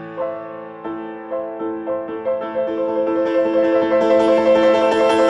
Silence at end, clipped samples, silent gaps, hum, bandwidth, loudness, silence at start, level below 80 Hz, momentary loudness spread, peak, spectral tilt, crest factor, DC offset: 0 s; under 0.1%; none; none; 10 kHz; -18 LUFS; 0 s; -58 dBFS; 15 LU; -4 dBFS; -5.5 dB/octave; 14 dB; under 0.1%